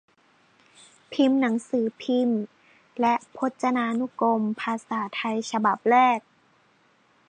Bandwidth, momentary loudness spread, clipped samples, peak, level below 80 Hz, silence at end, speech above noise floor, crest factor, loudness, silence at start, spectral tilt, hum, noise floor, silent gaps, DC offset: 9.6 kHz; 10 LU; under 0.1%; -8 dBFS; -78 dBFS; 1.1 s; 39 dB; 18 dB; -25 LUFS; 1.1 s; -5 dB/octave; none; -62 dBFS; none; under 0.1%